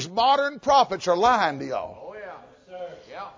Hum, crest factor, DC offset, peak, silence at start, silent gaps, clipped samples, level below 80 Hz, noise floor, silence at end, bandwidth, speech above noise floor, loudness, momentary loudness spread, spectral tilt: none; 18 dB; under 0.1%; -6 dBFS; 0 s; none; under 0.1%; -58 dBFS; -43 dBFS; 0.05 s; 7.6 kHz; 21 dB; -22 LUFS; 19 LU; -3.5 dB/octave